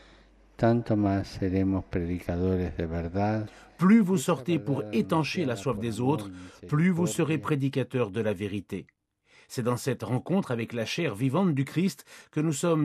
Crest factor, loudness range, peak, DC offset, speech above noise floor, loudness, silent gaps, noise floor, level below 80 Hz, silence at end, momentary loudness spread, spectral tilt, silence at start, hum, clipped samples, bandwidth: 16 dB; 4 LU; -10 dBFS; under 0.1%; 34 dB; -28 LUFS; none; -61 dBFS; -52 dBFS; 0 s; 8 LU; -6.5 dB/octave; 0.6 s; none; under 0.1%; 14.5 kHz